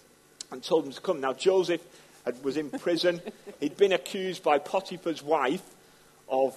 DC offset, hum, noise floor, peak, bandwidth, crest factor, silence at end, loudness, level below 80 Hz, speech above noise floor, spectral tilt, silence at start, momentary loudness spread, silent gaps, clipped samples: under 0.1%; none; -57 dBFS; -10 dBFS; 13 kHz; 20 dB; 0 s; -29 LUFS; -76 dBFS; 29 dB; -4.5 dB/octave; 0.5 s; 12 LU; none; under 0.1%